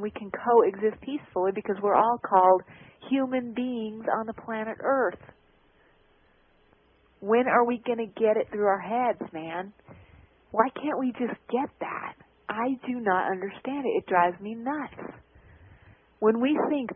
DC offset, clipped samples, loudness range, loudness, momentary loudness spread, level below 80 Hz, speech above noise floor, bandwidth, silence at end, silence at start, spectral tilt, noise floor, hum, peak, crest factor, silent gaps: under 0.1%; under 0.1%; 6 LU; -27 LUFS; 13 LU; -66 dBFS; 36 dB; 3.7 kHz; 0 s; 0 s; -10 dB/octave; -63 dBFS; none; -6 dBFS; 20 dB; none